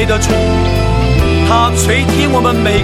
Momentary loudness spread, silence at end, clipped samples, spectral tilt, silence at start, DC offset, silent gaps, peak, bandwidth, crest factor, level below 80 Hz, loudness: 2 LU; 0 s; under 0.1%; -5 dB/octave; 0 s; 0.3%; none; 0 dBFS; 15.5 kHz; 10 dB; -18 dBFS; -11 LUFS